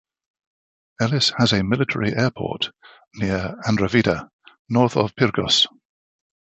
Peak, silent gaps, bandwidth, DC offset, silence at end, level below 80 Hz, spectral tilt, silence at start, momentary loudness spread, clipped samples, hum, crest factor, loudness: -2 dBFS; 4.33-4.39 s, 4.59-4.65 s; 8.4 kHz; under 0.1%; 0.85 s; -48 dBFS; -5 dB/octave; 1 s; 8 LU; under 0.1%; none; 20 dB; -20 LUFS